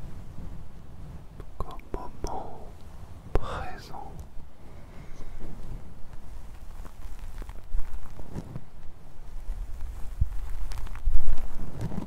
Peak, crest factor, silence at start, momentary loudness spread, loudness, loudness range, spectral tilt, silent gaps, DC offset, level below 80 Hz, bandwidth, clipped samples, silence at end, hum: -4 dBFS; 20 dB; 0 s; 14 LU; -40 LUFS; 8 LU; -6.5 dB/octave; none; under 0.1%; -32 dBFS; 6 kHz; under 0.1%; 0 s; none